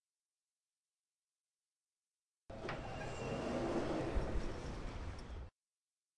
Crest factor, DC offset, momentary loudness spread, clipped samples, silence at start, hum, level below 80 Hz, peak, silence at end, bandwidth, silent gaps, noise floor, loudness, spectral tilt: 20 dB; under 0.1%; 13 LU; under 0.1%; 2.5 s; none; -50 dBFS; -24 dBFS; 0.7 s; 11 kHz; none; under -90 dBFS; -43 LUFS; -6.5 dB/octave